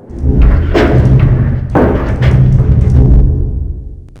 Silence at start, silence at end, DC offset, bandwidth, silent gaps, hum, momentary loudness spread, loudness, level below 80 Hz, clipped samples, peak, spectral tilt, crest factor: 0.1 s; 0.2 s; under 0.1%; 6.2 kHz; none; none; 8 LU; -10 LUFS; -12 dBFS; 1%; 0 dBFS; -9.5 dB/octave; 8 dB